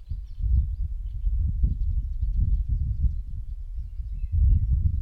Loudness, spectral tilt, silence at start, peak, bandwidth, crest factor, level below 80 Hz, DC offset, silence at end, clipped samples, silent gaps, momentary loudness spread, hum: -29 LUFS; -11 dB/octave; 0 s; -12 dBFS; 0.5 kHz; 14 dB; -26 dBFS; under 0.1%; 0 s; under 0.1%; none; 14 LU; none